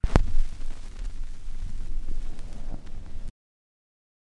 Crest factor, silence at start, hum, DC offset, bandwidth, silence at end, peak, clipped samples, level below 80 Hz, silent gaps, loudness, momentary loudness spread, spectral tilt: 24 dB; 0.05 s; none; under 0.1%; 6.8 kHz; 1 s; 0 dBFS; under 0.1%; -28 dBFS; none; -37 LUFS; 13 LU; -6.5 dB/octave